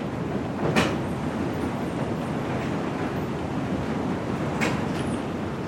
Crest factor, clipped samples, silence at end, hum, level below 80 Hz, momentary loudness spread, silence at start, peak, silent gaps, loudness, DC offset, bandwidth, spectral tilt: 20 dB; under 0.1%; 0 s; none; -48 dBFS; 5 LU; 0 s; -6 dBFS; none; -27 LUFS; under 0.1%; 16.5 kHz; -6.5 dB/octave